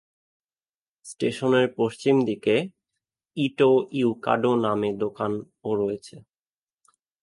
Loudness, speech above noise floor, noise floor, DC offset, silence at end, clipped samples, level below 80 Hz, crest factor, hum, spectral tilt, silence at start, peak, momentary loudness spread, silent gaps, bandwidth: -24 LUFS; over 67 dB; under -90 dBFS; under 0.1%; 1 s; under 0.1%; -66 dBFS; 20 dB; none; -6.5 dB/octave; 1.05 s; -6 dBFS; 9 LU; none; 11.5 kHz